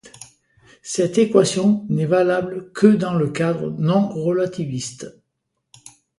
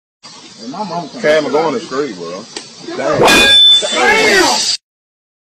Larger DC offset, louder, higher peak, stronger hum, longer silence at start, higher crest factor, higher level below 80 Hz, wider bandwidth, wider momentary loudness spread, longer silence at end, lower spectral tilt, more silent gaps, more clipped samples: neither; second, -19 LUFS vs -9 LUFS; about the same, 0 dBFS vs 0 dBFS; neither; second, 0.05 s vs 0.25 s; first, 20 dB vs 14 dB; second, -60 dBFS vs -44 dBFS; second, 11.5 kHz vs 16 kHz; second, 13 LU vs 22 LU; first, 1.1 s vs 0.65 s; first, -6 dB/octave vs -1.5 dB/octave; neither; neither